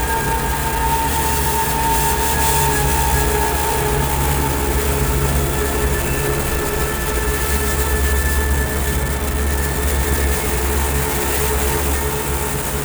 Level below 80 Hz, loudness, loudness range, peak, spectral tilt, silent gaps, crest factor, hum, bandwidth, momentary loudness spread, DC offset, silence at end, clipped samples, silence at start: -22 dBFS; -18 LUFS; 2 LU; -4 dBFS; -4 dB/octave; none; 14 dB; none; over 20 kHz; 4 LU; under 0.1%; 0 s; under 0.1%; 0 s